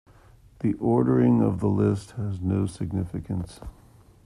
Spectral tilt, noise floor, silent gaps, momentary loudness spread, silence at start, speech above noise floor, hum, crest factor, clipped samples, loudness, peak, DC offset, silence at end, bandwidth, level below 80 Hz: -9 dB/octave; -53 dBFS; none; 13 LU; 0.6 s; 29 dB; none; 16 dB; under 0.1%; -25 LUFS; -8 dBFS; under 0.1%; 0.55 s; 11.5 kHz; -50 dBFS